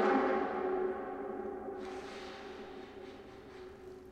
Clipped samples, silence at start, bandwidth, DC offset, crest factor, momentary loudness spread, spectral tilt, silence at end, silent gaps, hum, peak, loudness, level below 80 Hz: under 0.1%; 0 s; 9 kHz; under 0.1%; 18 dB; 18 LU; -6 dB/octave; 0 s; none; none; -18 dBFS; -38 LUFS; -66 dBFS